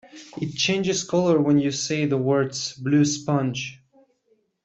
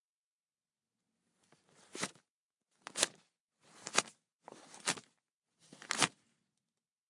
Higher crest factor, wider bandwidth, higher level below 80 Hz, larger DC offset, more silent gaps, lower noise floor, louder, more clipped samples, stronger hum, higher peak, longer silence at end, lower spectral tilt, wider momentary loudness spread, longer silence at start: second, 16 dB vs 36 dB; second, 8.2 kHz vs 11.5 kHz; first, -62 dBFS vs -88 dBFS; neither; second, none vs 2.30-2.49 s, 3.40-3.48 s, 4.35-4.39 s, 5.34-5.42 s; second, -67 dBFS vs under -90 dBFS; first, -23 LUFS vs -37 LUFS; neither; neither; about the same, -8 dBFS vs -8 dBFS; about the same, 0.9 s vs 1 s; first, -5 dB/octave vs -0.5 dB/octave; second, 12 LU vs 22 LU; second, 0.15 s vs 1.95 s